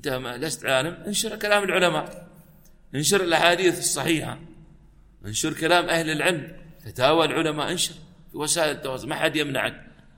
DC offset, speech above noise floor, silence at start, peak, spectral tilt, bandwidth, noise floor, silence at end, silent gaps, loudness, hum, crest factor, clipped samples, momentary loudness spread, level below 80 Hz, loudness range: under 0.1%; 28 dB; 0.05 s; -2 dBFS; -3 dB/octave; 16.5 kHz; -51 dBFS; 0.3 s; none; -23 LUFS; none; 22 dB; under 0.1%; 13 LU; -52 dBFS; 2 LU